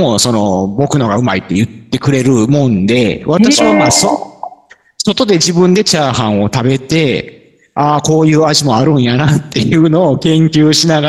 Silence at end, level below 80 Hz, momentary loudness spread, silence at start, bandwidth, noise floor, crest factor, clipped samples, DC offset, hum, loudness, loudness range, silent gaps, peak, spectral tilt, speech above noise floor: 0 s; -44 dBFS; 7 LU; 0 s; 12.5 kHz; -41 dBFS; 10 dB; under 0.1%; 0.3%; none; -11 LUFS; 2 LU; none; 0 dBFS; -5 dB/octave; 31 dB